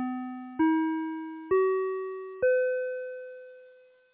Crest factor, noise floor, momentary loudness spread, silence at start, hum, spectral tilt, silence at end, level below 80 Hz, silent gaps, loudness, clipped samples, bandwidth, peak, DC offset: 14 dB; -57 dBFS; 16 LU; 0 s; none; -9 dB/octave; 0.4 s; -68 dBFS; none; -29 LUFS; under 0.1%; 3.8 kHz; -16 dBFS; under 0.1%